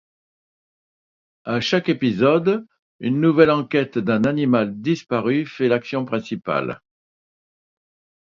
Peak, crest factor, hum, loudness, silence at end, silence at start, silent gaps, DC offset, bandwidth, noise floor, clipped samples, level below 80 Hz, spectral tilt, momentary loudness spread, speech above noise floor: 0 dBFS; 22 dB; none; -20 LUFS; 1.55 s; 1.45 s; 2.79-2.99 s; under 0.1%; 7.4 kHz; under -90 dBFS; under 0.1%; -60 dBFS; -7 dB/octave; 10 LU; over 71 dB